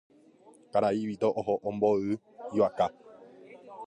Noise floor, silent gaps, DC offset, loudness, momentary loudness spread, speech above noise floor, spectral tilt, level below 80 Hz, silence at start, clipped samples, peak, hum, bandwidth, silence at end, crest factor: -58 dBFS; none; under 0.1%; -29 LUFS; 8 LU; 29 dB; -7.5 dB/octave; -68 dBFS; 0.75 s; under 0.1%; -12 dBFS; none; 10.5 kHz; 0 s; 18 dB